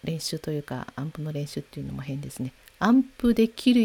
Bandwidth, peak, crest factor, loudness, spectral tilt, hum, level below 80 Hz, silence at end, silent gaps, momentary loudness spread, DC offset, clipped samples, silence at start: 16 kHz; -8 dBFS; 18 dB; -27 LUFS; -6 dB/octave; none; -52 dBFS; 0 s; none; 14 LU; under 0.1%; under 0.1%; 0.05 s